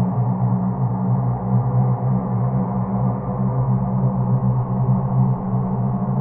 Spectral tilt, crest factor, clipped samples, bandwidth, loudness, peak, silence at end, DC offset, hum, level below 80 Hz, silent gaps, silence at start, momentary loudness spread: -16 dB/octave; 12 dB; under 0.1%; 2.2 kHz; -20 LUFS; -8 dBFS; 0 s; under 0.1%; none; -40 dBFS; none; 0 s; 3 LU